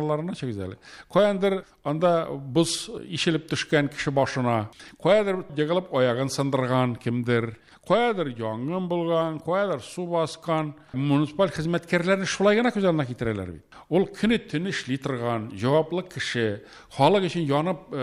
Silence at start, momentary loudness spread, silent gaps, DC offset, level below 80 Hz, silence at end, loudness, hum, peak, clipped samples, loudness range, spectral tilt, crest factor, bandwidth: 0 s; 9 LU; none; under 0.1%; -58 dBFS; 0 s; -25 LUFS; none; -4 dBFS; under 0.1%; 2 LU; -5.5 dB/octave; 20 dB; 13 kHz